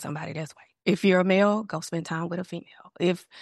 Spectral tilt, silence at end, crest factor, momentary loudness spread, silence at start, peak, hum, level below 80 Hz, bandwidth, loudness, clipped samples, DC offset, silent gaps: -6 dB/octave; 0 s; 18 dB; 16 LU; 0 s; -8 dBFS; none; -72 dBFS; 12.5 kHz; -26 LUFS; under 0.1%; under 0.1%; none